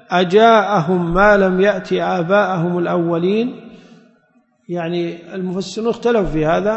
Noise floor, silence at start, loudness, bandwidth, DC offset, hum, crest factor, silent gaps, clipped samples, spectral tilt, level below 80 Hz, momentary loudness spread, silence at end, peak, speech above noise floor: -58 dBFS; 0.1 s; -16 LUFS; 8.4 kHz; under 0.1%; none; 16 dB; none; under 0.1%; -6.5 dB/octave; -38 dBFS; 13 LU; 0 s; 0 dBFS; 43 dB